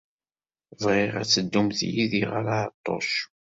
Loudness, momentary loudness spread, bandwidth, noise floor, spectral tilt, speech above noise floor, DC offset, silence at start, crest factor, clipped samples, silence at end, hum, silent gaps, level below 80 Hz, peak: -25 LUFS; 7 LU; 7.8 kHz; under -90 dBFS; -4 dB/octave; over 65 dB; under 0.1%; 0.8 s; 20 dB; under 0.1%; 0.2 s; none; 2.74-2.84 s; -60 dBFS; -8 dBFS